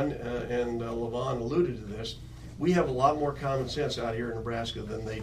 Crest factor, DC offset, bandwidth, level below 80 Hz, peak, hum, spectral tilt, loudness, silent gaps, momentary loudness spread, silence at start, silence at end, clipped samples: 20 dB; under 0.1%; 13.5 kHz; -48 dBFS; -10 dBFS; none; -6.5 dB/octave; -30 LUFS; none; 11 LU; 0 s; 0 s; under 0.1%